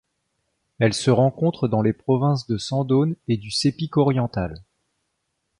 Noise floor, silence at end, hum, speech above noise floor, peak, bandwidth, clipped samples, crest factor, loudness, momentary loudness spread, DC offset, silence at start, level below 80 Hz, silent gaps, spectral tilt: -75 dBFS; 1 s; none; 55 dB; -4 dBFS; 11 kHz; under 0.1%; 18 dB; -22 LUFS; 7 LU; under 0.1%; 0.8 s; -50 dBFS; none; -6.5 dB/octave